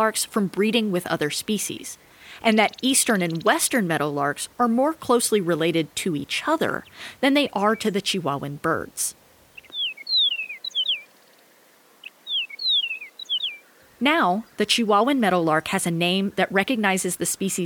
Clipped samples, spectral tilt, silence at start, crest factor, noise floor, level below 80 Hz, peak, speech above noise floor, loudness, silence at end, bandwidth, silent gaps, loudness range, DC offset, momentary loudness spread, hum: under 0.1%; -3 dB/octave; 0 s; 20 dB; -55 dBFS; -64 dBFS; -4 dBFS; 33 dB; -22 LUFS; 0 s; over 20 kHz; none; 4 LU; under 0.1%; 8 LU; none